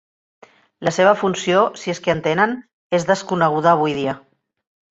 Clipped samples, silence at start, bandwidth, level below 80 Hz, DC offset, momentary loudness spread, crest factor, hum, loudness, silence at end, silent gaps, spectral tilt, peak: under 0.1%; 0.8 s; 8.2 kHz; -58 dBFS; under 0.1%; 9 LU; 18 dB; none; -18 LUFS; 0.75 s; 2.73-2.90 s; -5 dB/octave; -2 dBFS